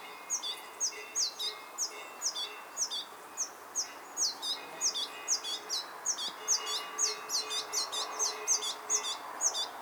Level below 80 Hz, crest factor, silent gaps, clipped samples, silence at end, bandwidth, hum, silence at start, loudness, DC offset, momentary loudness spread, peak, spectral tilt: -90 dBFS; 18 dB; none; under 0.1%; 0 s; over 20 kHz; none; 0 s; -33 LUFS; under 0.1%; 7 LU; -18 dBFS; 2.5 dB/octave